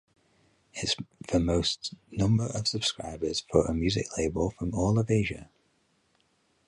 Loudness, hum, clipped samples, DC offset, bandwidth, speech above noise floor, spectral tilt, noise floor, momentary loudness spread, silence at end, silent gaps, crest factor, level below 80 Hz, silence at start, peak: -29 LUFS; none; under 0.1%; under 0.1%; 11.5 kHz; 42 dB; -5 dB/octave; -70 dBFS; 9 LU; 1.25 s; none; 22 dB; -44 dBFS; 0.75 s; -6 dBFS